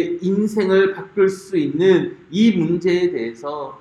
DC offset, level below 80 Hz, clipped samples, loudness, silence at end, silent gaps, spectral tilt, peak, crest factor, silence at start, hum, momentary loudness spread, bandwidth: under 0.1%; -60 dBFS; under 0.1%; -18 LUFS; 0.05 s; none; -7 dB/octave; -4 dBFS; 14 dB; 0 s; none; 10 LU; 11.5 kHz